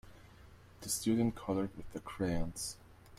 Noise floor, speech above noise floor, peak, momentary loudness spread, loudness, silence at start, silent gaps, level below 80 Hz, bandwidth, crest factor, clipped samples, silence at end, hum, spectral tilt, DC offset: -58 dBFS; 22 dB; -20 dBFS; 14 LU; -37 LUFS; 0.05 s; none; -52 dBFS; 16 kHz; 18 dB; under 0.1%; 0 s; none; -5 dB/octave; under 0.1%